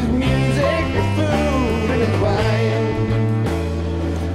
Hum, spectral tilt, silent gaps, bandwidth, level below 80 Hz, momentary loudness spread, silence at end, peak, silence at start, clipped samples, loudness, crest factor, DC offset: none; -7 dB/octave; none; 13.5 kHz; -30 dBFS; 5 LU; 0 s; -6 dBFS; 0 s; under 0.1%; -19 LUFS; 12 dB; under 0.1%